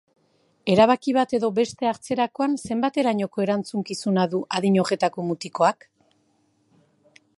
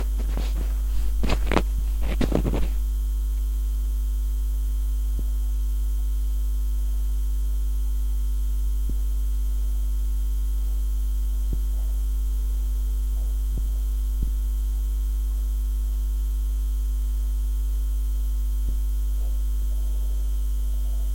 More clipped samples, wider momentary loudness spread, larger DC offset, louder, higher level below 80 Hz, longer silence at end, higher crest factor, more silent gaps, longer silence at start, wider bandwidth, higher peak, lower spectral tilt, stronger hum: neither; first, 9 LU vs 2 LU; second, under 0.1% vs 0.2%; first, -23 LUFS vs -28 LUFS; second, -64 dBFS vs -24 dBFS; first, 1.65 s vs 0 s; about the same, 20 dB vs 18 dB; neither; first, 0.65 s vs 0 s; second, 11.5 kHz vs 17 kHz; about the same, -4 dBFS vs -6 dBFS; about the same, -6 dB/octave vs -6.5 dB/octave; neither